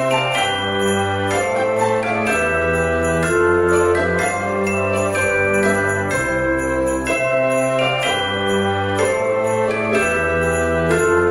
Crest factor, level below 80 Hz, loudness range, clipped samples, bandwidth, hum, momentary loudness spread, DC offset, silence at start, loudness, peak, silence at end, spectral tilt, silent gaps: 14 dB; -38 dBFS; 1 LU; under 0.1%; 16 kHz; none; 3 LU; under 0.1%; 0 s; -18 LUFS; -4 dBFS; 0 s; -4.5 dB/octave; none